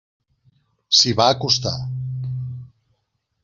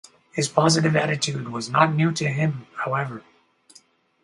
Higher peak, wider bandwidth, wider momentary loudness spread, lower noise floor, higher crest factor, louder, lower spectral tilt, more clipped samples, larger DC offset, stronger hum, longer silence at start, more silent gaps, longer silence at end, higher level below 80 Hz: about the same, -2 dBFS vs 0 dBFS; second, 7.4 kHz vs 11.5 kHz; first, 16 LU vs 11 LU; first, -72 dBFS vs -56 dBFS; about the same, 22 dB vs 22 dB; first, -18 LUFS vs -22 LUFS; second, -3.5 dB/octave vs -5 dB/octave; neither; neither; neither; first, 0.9 s vs 0.35 s; neither; second, 0.75 s vs 1.05 s; first, -54 dBFS vs -64 dBFS